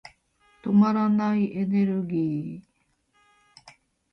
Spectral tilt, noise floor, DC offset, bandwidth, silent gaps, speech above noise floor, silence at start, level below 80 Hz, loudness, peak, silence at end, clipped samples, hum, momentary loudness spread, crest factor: -9.5 dB/octave; -69 dBFS; under 0.1%; 6 kHz; none; 46 dB; 0.05 s; -66 dBFS; -24 LUFS; -10 dBFS; 0.4 s; under 0.1%; none; 15 LU; 16 dB